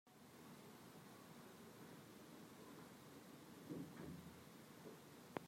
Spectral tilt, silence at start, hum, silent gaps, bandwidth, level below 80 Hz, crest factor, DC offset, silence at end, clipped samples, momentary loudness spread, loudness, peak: -5 dB/octave; 0.05 s; none; none; 16 kHz; -84 dBFS; 30 dB; under 0.1%; 0 s; under 0.1%; 7 LU; -59 LUFS; -28 dBFS